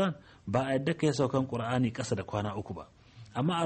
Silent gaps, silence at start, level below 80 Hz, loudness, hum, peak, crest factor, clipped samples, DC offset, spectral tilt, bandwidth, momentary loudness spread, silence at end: none; 0 s; -60 dBFS; -31 LUFS; none; -16 dBFS; 16 dB; under 0.1%; under 0.1%; -6.5 dB/octave; 8.8 kHz; 12 LU; 0 s